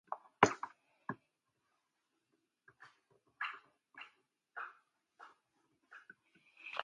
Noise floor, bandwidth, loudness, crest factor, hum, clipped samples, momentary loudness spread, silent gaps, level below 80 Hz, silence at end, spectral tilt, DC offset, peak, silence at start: -85 dBFS; 11 kHz; -39 LUFS; 38 dB; none; under 0.1%; 29 LU; none; -78 dBFS; 0 s; -4 dB/octave; under 0.1%; -8 dBFS; 0.1 s